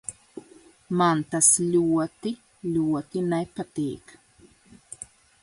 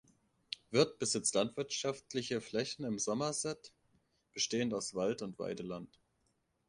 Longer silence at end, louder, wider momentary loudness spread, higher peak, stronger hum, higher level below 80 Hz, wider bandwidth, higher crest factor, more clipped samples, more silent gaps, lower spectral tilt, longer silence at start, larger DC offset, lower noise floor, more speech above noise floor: second, 0.4 s vs 0.8 s; first, -24 LUFS vs -36 LUFS; first, 25 LU vs 14 LU; first, -4 dBFS vs -14 dBFS; neither; first, -62 dBFS vs -74 dBFS; about the same, 11.5 kHz vs 11.5 kHz; about the same, 24 dB vs 24 dB; neither; neither; about the same, -4.5 dB/octave vs -3.5 dB/octave; second, 0.1 s vs 0.5 s; neither; second, -56 dBFS vs -79 dBFS; second, 32 dB vs 42 dB